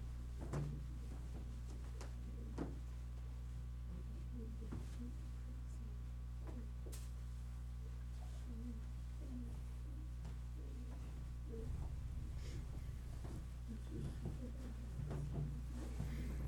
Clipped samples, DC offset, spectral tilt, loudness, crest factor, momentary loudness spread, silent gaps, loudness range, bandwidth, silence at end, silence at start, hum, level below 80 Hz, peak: under 0.1%; under 0.1%; -7 dB/octave; -49 LUFS; 16 dB; 4 LU; none; 2 LU; 13.5 kHz; 0 s; 0 s; 60 Hz at -50 dBFS; -48 dBFS; -30 dBFS